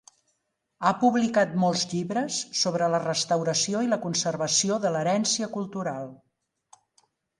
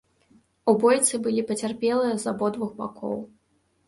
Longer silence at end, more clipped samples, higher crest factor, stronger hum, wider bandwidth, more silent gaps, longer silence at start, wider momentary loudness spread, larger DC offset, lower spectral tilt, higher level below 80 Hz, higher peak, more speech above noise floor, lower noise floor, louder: first, 1.25 s vs 0.6 s; neither; about the same, 20 dB vs 20 dB; neither; about the same, 11.5 kHz vs 11.5 kHz; neither; first, 0.8 s vs 0.65 s; second, 8 LU vs 13 LU; neither; about the same, -3.5 dB/octave vs -4 dB/octave; about the same, -70 dBFS vs -68 dBFS; about the same, -6 dBFS vs -6 dBFS; first, 52 dB vs 44 dB; first, -77 dBFS vs -68 dBFS; about the same, -25 LUFS vs -24 LUFS